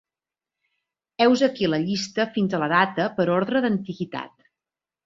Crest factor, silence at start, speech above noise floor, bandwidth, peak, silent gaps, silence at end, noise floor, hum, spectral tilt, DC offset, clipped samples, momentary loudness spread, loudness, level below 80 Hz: 20 dB; 1.2 s; over 68 dB; 7.8 kHz; -4 dBFS; none; 0.8 s; under -90 dBFS; none; -5.5 dB/octave; under 0.1%; under 0.1%; 12 LU; -23 LUFS; -64 dBFS